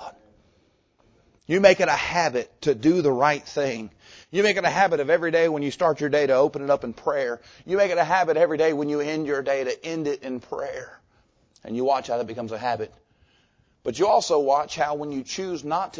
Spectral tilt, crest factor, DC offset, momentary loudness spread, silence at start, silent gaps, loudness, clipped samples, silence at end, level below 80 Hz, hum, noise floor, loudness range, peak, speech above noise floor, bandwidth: -4.5 dB/octave; 22 dB; under 0.1%; 12 LU; 0 s; none; -23 LUFS; under 0.1%; 0 s; -60 dBFS; none; -64 dBFS; 7 LU; -2 dBFS; 41 dB; 8 kHz